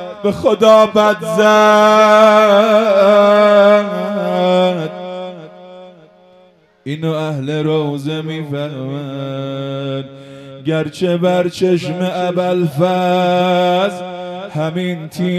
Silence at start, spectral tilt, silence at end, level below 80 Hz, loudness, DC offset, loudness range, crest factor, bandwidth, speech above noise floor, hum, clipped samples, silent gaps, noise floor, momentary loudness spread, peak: 0 s; -6 dB/octave; 0 s; -56 dBFS; -13 LUFS; under 0.1%; 12 LU; 14 dB; 14 kHz; 36 dB; none; under 0.1%; none; -49 dBFS; 16 LU; 0 dBFS